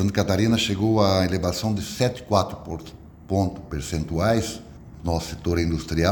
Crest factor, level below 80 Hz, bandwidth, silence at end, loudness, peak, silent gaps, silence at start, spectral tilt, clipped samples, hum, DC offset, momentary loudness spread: 20 dB; -40 dBFS; 19 kHz; 0 s; -24 LUFS; -4 dBFS; none; 0 s; -5.5 dB/octave; under 0.1%; none; under 0.1%; 14 LU